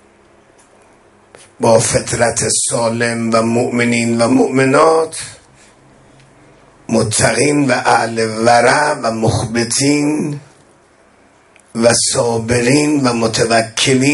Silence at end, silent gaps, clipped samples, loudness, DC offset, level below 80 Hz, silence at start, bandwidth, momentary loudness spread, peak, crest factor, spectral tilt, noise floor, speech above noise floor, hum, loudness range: 0 s; none; under 0.1%; -13 LUFS; under 0.1%; -44 dBFS; 1.6 s; 12 kHz; 7 LU; 0 dBFS; 14 dB; -4 dB/octave; -49 dBFS; 36 dB; none; 3 LU